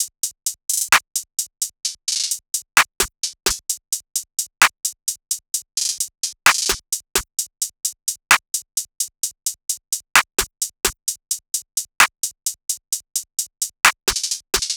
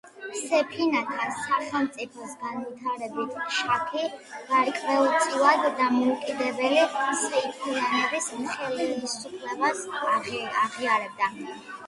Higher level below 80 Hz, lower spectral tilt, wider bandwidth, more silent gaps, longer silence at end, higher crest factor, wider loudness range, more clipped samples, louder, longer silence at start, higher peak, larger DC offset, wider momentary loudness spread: first, -48 dBFS vs -72 dBFS; second, 1.5 dB/octave vs -2.5 dB/octave; first, over 20 kHz vs 11.5 kHz; neither; about the same, 0 s vs 0 s; about the same, 22 dB vs 20 dB; second, 2 LU vs 5 LU; neither; first, -20 LUFS vs -26 LUFS; about the same, 0 s vs 0.05 s; first, -2 dBFS vs -6 dBFS; neither; about the same, 10 LU vs 11 LU